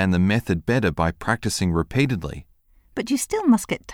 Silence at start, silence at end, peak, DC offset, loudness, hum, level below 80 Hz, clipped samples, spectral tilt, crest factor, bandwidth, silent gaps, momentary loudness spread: 0 s; 0 s; -6 dBFS; under 0.1%; -22 LUFS; none; -42 dBFS; under 0.1%; -5.5 dB/octave; 16 dB; 17.5 kHz; none; 11 LU